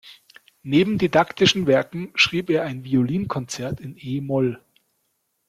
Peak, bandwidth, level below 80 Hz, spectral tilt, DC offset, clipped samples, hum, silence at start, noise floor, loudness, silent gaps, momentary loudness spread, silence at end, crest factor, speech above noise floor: -4 dBFS; 15 kHz; -56 dBFS; -5 dB/octave; under 0.1%; under 0.1%; none; 0.05 s; -72 dBFS; -21 LUFS; none; 12 LU; 0.9 s; 18 dB; 51 dB